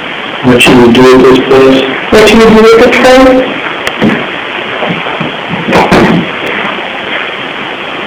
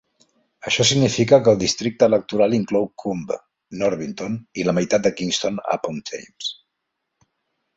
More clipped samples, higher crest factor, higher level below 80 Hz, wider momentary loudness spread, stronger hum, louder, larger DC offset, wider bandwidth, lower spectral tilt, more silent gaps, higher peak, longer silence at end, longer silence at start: first, 20% vs under 0.1%; second, 6 dB vs 20 dB; first, -30 dBFS vs -56 dBFS; about the same, 12 LU vs 14 LU; neither; first, -6 LUFS vs -20 LUFS; neither; first, over 20 kHz vs 8 kHz; about the same, -5 dB/octave vs -4.5 dB/octave; neither; about the same, 0 dBFS vs -2 dBFS; second, 0 s vs 1.25 s; second, 0 s vs 0.65 s